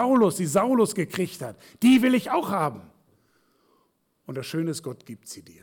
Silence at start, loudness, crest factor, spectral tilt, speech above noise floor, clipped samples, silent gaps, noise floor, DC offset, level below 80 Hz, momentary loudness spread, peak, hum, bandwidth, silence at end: 0 s; -23 LUFS; 14 dB; -5.5 dB/octave; 45 dB; under 0.1%; none; -69 dBFS; under 0.1%; -68 dBFS; 21 LU; -12 dBFS; none; 18 kHz; 0.2 s